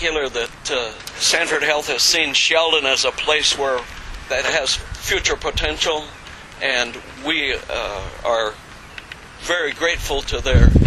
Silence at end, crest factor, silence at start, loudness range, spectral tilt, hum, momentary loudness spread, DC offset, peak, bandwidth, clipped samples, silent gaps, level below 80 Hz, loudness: 0 s; 20 dB; 0 s; 7 LU; -3 dB/octave; none; 18 LU; under 0.1%; 0 dBFS; 14.5 kHz; under 0.1%; none; -26 dBFS; -19 LUFS